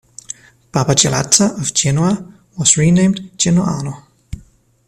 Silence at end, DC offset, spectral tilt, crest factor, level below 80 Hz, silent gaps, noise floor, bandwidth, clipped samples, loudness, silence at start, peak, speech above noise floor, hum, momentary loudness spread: 0.45 s; under 0.1%; -4 dB/octave; 16 dB; -44 dBFS; none; -47 dBFS; 14 kHz; under 0.1%; -14 LUFS; 0.3 s; 0 dBFS; 33 dB; none; 23 LU